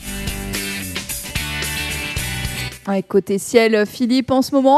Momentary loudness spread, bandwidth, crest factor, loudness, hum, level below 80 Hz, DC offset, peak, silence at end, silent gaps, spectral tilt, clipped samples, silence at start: 10 LU; 14 kHz; 18 dB; -20 LUFS; none; -36 dBFS; under 0.1%; 0 dBFS; 0 s; none; -4 dB/octave; under 0.1%; 0 s